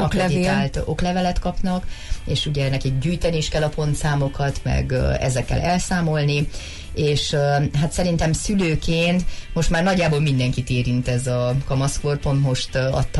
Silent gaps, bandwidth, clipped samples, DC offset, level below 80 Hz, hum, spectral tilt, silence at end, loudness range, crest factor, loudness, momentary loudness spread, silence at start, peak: none; 11.5 kHz; under 0.1%; under 0.1%; -30 dBFS; none; -5.5 dB/octave; 0 s; 2 LU; 10 dB; -21 LUFS; 5 LU; 0 s; -10 dBFS